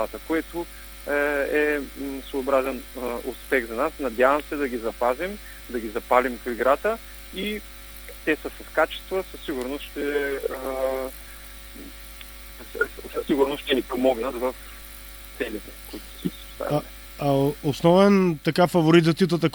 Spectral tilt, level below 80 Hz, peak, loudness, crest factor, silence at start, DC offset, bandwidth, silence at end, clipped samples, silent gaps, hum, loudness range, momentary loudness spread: -6 dB/octave; -46 dBFS; -4 dBFS; -24 LUFS; 22 dB; 0 s; under 0.1%; over 20 kHz; 0 s; under 0.1%; none; none; 7 LU; 19 LU